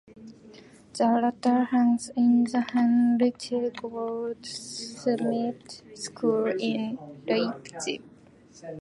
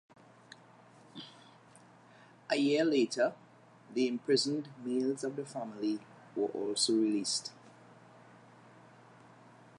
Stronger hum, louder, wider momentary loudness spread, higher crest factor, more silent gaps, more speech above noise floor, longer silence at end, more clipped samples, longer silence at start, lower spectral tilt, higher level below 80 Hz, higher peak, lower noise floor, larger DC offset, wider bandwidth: neither; first, -26 LUFS vs -33 LUFS; second, 15 LU vs 20 LU; about the same, 16 dB vs 20 dB; neither; about the same, 28 dB vs 27 dB; second, 0 s vs 2.1 s; neither; second, 0.15 s vs 1.15 s; first, -5 dB/octave vs -3.5 dB/octave; first, -70 dBFS vs -88 dBFS; first, -12 dBFS vs -16 dBFS; second, -53 dBFS vs -59 dBFS; neither; about the same, 11.5 kHz vs 11.5 kHz